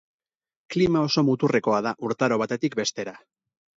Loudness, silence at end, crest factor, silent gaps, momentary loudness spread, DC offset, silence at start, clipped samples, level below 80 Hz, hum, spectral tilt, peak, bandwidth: -24 LUFS; 0.6 s; 18 dB; none; 8 LU; under 0.1%; 0.7 s; under 0.1%; -58 dBFS; none; -5.5 dB/octave; -8 dBFS; 7.8 kHz